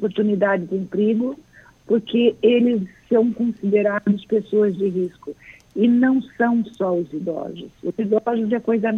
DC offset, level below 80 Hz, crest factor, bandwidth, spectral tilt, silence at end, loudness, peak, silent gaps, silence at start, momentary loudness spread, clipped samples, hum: under 0.1%; -60 dBFS; 16 dB; 6.6 kHz; -8.5 dB/octave; 0 s; -20 LUFS; -4 dBFS; none; 0 s; 12 LU; under 0.1%; none